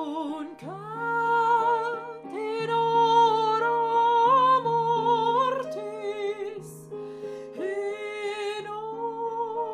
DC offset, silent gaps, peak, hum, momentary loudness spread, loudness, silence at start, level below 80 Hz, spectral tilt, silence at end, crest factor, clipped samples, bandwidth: under 0.1%; none; -10 dBFS; none; 17 LU; -25 LUFS; 0 s; -76 dBFS; -5 dB/octave; 0 s; 16 dB; under 0.1%; 12 kHz